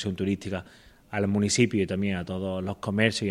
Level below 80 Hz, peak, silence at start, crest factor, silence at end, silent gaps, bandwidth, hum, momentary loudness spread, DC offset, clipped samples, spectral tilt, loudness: -56 dBFS; -6 dBFS; 0 s; 22 dB; 0 s; none; 12.5 kHz; none; 10 LU; under 0.1%; under 0.1%; -5 dB/octave; -27 LUFS